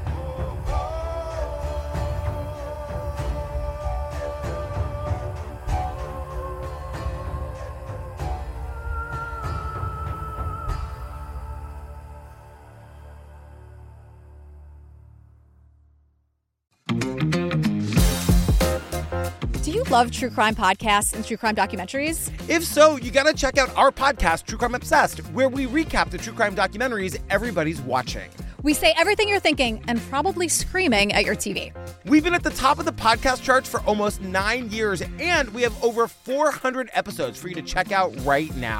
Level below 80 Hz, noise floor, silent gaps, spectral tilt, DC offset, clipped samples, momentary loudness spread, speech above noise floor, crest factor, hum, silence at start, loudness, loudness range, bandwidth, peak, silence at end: -34 dBFS; -71 dBFS; none; -4.5 dB/octave; under 0.1%; under 0.1%; 14 LU; 49 dB; 22 dB; none; 0 s; -23 LUFS; 12 LU; 17 kHz; -2 dBFS; 0 s